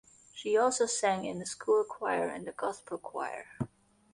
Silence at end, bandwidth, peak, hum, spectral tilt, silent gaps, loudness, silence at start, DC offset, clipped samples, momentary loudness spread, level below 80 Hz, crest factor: 0.5 s; 11.5 kHz; -16 dBFS; none; -3.5 dB/octave; none; -32 LUFS; 0.35 s; under 0.1%; under 0.1%; 13 LU; -70 dBFS; 18 dB